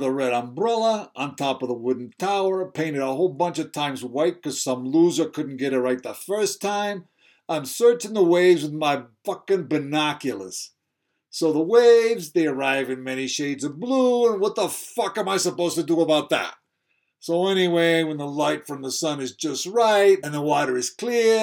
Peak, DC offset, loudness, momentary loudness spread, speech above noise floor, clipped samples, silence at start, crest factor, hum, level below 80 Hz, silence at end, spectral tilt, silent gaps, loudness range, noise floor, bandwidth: -4 dBFS; under 0.1%; -22 LUFS; 10 LU; 55 dB; under 0.1%; 0 s; 18 dB; none; -82 dBFS; 0 s; -4 dB/octave; none; 3 LU; -77 dBFS; 18 kHz